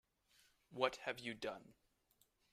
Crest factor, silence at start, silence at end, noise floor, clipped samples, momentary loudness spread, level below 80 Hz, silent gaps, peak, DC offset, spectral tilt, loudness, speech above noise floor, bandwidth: 28 dB; 0.7 s; 0.8 s; -79 dBFS; under 0.1%; 16 LU; -80 dBFS; none; -20 dBFS; under 0.1%; -3.5 dB/octave; -44 LUFS; 35 dB; 15 kHz